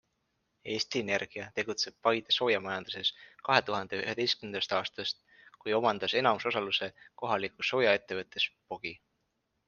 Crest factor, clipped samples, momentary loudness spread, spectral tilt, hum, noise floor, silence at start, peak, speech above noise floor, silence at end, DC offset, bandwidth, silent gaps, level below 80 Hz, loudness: 26 dB; under 0.1%; 12 LU; -3.5 dB/octave; none; -80 dBFS; 0.65 s; -6 dBFS; 48 dB; 0.7 s; under 0.1%; 7.4 kHz; none; -74 dBFS; -31 LUFS